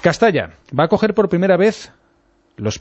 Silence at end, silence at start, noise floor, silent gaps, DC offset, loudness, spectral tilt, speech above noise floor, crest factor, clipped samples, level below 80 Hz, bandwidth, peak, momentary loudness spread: 0 s; 0 s; -58 dBFS; none; under 0.1%; -16 LUFS; -6 dB/octave; 43 dB; 16 dB; under 0.1%; -50 dBFS; 8.4 kHz; -2 dBFS; 11 LU